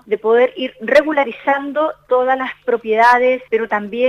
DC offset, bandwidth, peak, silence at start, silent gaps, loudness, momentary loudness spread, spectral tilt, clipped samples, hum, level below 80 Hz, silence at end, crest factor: under 0.1%; 10.5 kHz; 0 dBFS; 0.05 s; none; -16 LUFS; 8 LU; -5 dB/octave; under 0.1%; 50 Hz at -60 dBFS; -58 dBFS; 0 s; 14 dB